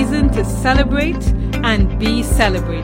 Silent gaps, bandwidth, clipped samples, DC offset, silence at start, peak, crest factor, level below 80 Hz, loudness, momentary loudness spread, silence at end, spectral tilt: none; 16.5 kHz; under 0.1%; under 0.1%; 0 s; -2 dBFS; 14 dB; -20 dBFS; -16 LUFS; 3 LU; 0 s; -5.5 dB/octave